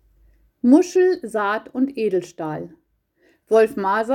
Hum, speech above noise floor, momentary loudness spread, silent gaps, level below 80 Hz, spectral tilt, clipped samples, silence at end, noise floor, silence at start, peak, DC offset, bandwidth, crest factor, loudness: none; 43 dB; 14 LU; none; -62 dBFS; -6 dB/octave; under 0.1%; 0 s; -62 dBFS; 0.65 s; -2 dBFS; under 0.1%; 14 kHz; 18 dB; -20 LUFS